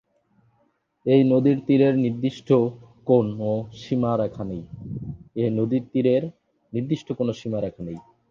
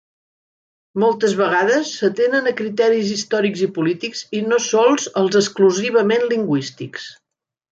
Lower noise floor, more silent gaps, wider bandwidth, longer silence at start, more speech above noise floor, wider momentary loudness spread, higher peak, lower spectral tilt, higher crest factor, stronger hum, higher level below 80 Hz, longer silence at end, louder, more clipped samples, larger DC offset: second, -67 dBFS vs -82 dBFS; neither; second, 7.2 kHz vs 9 kHz; about the same, 1.05 s vs 0.95 s; second, 45 dB vs 64 dB; first, 16 LU vs 10 LU; about the same, -6 dBFS vs -4 dBFS; first, -9 dB/octave vs -4 dB/octave; about the same, 18 dB vs 16 dB; neither; first, -56 dBFS vs -68 dBFS; second, 0.3 s vs 0.6 s; second, -23 LUFS vs -18 LUFS; neither; neither